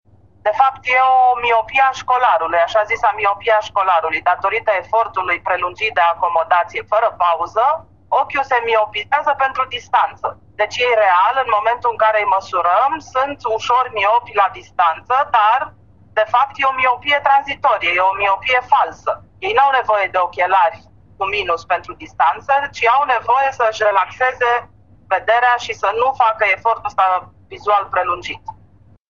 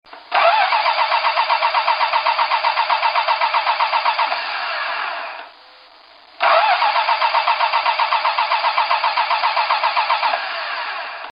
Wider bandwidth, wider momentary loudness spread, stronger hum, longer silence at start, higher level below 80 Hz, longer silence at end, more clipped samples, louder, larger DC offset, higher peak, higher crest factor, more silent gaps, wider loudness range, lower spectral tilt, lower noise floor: first, 7.4 kHz vs 5.6 kHz; about the same, 7 LU vs 8 LU; neither; first, 0.45 s vs 0.1 s; first, -54 dBFS vs -76 dBFS; first, 0.55 s vs 0 s; neither; about the same, -16 LUFS vs -17 LUFS; first, 0.2% vs under 0.1%; about the same, 0 dBFS vs -2 dBFS; about the same, 16 dB vs 18 dB; neither; about the same, 2 LU vs 3 LU; first, -3 dB/octave vs -1.5 dB/octave; about the same, -49 dBFS vs -46 dBFS